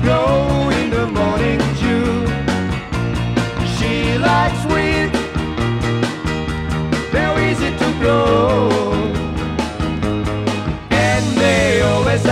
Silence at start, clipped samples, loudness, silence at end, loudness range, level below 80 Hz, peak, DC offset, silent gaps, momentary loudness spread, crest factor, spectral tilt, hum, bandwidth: 0 s; under 0.1%; -17 LUFS; 0 s; 1 LU; -28 dBFS; -2 dBFS; under 0.1%; none; 7 LU; 14 dB; -6 dB/octave; none; 14 kHz